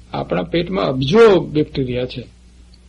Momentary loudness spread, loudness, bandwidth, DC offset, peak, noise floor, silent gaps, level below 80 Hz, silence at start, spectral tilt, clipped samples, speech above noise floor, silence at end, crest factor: 13 LU; -16 LUFS; 9.6 kHz; under 0.1%; -2 dBFS; -45 dBFS; none; -40 dBFS; 0.15 s; -7 dB/octave; under 0.1%; 29 dB; 0.65 s; 14 dB